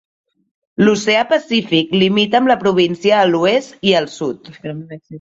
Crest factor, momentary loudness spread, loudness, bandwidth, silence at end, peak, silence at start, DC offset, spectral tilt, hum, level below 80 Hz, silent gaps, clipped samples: 14 dB; 16 LU; -15 LUFS; 7.8 kHz; 0 s; -2 dBFS; 0.8 s; under 0.1%; -5 dB/octave; none; -56 dBFS; none; under 0.1%